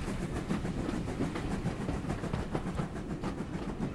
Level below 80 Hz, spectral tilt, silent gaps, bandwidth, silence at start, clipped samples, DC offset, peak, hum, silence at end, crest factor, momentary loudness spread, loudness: -44 dBFS; -7 dB/octave; none; 13 kHz; 0 s; under 0.1%; under 0.1%; -18 dBFS; none; 0 s; 18 dB; 3 LU; -36 LUFS